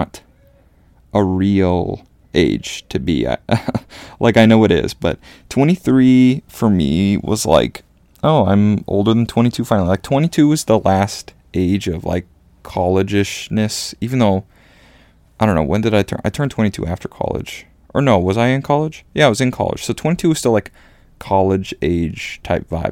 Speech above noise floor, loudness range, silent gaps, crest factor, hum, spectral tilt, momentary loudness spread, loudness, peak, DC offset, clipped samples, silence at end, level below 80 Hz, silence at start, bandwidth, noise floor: 35 dB; 5 LU; none; 16 dB; none; -6 dB/octave; 10 LU; -16 LUFS; 0 dBFS; under 0.1%; under 0.1%; 0 s; -40 dBFS; 0 s; 16.5 kHz; -50 dBFS